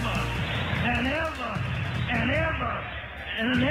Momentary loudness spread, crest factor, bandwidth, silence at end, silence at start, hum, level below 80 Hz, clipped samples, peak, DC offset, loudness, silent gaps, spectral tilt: 7 LU; 16 dB; 15 kHz; 0 s; 0 s; none; -40 dBFS; under 0.1%; -12 dBFS; under 0.1%; -28 LUFS; none; -6 dB/octave